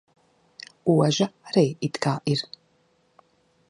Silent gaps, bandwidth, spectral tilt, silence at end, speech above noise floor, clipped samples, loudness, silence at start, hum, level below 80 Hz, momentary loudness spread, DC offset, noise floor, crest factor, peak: none; 11 kHz; -6 dB/octave; 1.25 s; 42 dB; under 0.1%; -24 LUFS; 0.85 s; none; -68 dBFS; 18 LU; under 0.1%; -65 dBFS; 20 dB; -6 dBFS